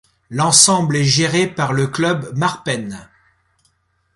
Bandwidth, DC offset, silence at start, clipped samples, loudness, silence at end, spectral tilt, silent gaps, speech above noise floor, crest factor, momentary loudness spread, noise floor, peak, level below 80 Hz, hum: 14 kHz; under 0.1%; 0.3 s; under 0.1%; -15 LUFS; 1.1 s; -3 dB/octave; none; 47 dB; 18 dB; 15 LU; -63 dBFS; 0 dBFS; -54 dBFS; none